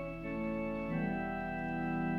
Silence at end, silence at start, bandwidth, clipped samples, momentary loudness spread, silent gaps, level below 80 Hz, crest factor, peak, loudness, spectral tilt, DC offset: 0 s; 0 s; 5.8 kHz; under 0.1%; 3 LU; none; -54 dBFS; 12 dB; -24 dBFS; -37 LUFS; -9 dB/octave; under 0.1%